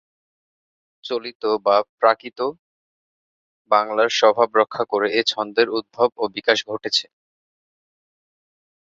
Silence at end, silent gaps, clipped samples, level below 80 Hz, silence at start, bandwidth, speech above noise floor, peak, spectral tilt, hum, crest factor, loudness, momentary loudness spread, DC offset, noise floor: 1.8 s; 1.35-1.40 s, 1.89-1.98 s, 2.59-3.65 s; under 0.1%; -70 dBFS; 1.05 s; 7.8 kHz; over 70 dB; -2 dBFS; -2.5 dB/octave; none; 20 dB; -20 LUFS; 11 LU; under 0.1%; under -90 dBFS